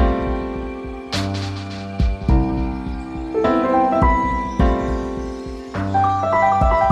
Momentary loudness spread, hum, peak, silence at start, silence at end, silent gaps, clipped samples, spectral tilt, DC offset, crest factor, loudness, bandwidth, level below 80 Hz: 13 LU; none; -4 dBFS; 0 s; 0 s; none; under 0.1%; -7 dB/octave; under 0.1%; 16 dB; -20 LUFS; 10 kHz; -24 dBFS